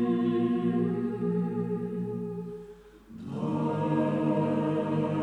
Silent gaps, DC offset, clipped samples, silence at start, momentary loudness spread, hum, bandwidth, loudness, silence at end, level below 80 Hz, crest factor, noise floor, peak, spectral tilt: none; under 0.1%; under 0.1%; 0 s; 13 LU; none; 8.8 kHz; -29 LUFS; 0 s; -62 dBFS; 14 dB; -49 dBFS; -16 dBFS; -9.5 dB/octave